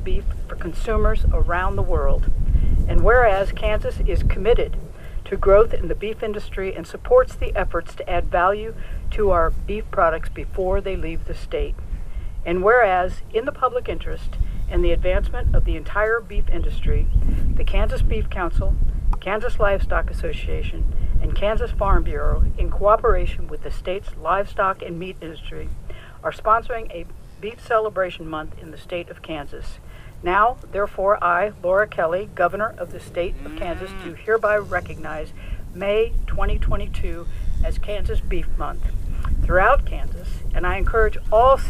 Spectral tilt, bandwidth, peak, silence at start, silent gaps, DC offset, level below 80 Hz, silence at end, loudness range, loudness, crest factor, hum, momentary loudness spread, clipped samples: -7 dB/octave; 8.4 kHz; -2 dBFS; 0 s; none; under 0.1%; -22 dBFS; 0 s; 5 LU; -23 LUFS; 18 dB; none; 15 LU; under 0.1%